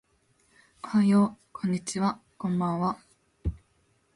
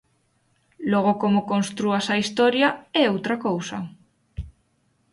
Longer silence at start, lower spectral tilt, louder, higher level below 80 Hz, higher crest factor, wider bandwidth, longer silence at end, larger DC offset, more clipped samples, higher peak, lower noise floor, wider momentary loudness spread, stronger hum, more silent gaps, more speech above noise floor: about the same, 0.85 s vs 0.8 s; first, -6.5 dB/octave vs -5 dB/octave; second, -28 LUFS vs -22 LUFS; about the same, -48 dBFS vs -50 dBFS; about the same, 16 dB vs 18 dB; about the same, 11.5 kHz vs 11.5 kHz; about the same, 0.6 s vs 0.65 s; neither; neither; second, -14 dBFS vs -6 dBFS; about the same, -68 dBFS vs -67 dBFS; second, 14 LU vs 19 LU; neither; neither; about the same, 43 dB vs 45 dB